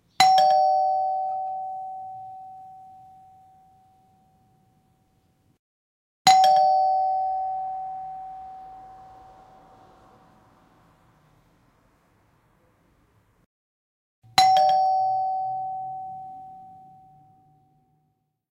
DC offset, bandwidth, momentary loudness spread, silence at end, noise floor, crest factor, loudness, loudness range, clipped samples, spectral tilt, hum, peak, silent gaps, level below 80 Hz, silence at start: under 0.1%; 16 kHz; 26 LU; 1.8 s; -73 dBFS; 22 dB; -22 LUFS; 17 LU; under 0.1%; -1 dB/octave; none; -4 dBFS; 5.59-6.25 s, 13.46-14.22 s; -68 dBFS; 0.2 s